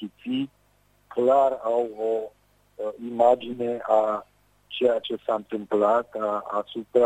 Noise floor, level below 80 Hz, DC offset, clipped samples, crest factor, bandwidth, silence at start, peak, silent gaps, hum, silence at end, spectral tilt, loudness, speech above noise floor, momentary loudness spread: -63 dBFS; -68 dBFS; under 0.1%; under 0.1%; 18 dB; 9.2 kHz; 0 s; -6 dBFS; none; 50 Hz at -65 dBFS; 0 s; -6 dB/octave; -25 LUFS; 39 dB; 12 LU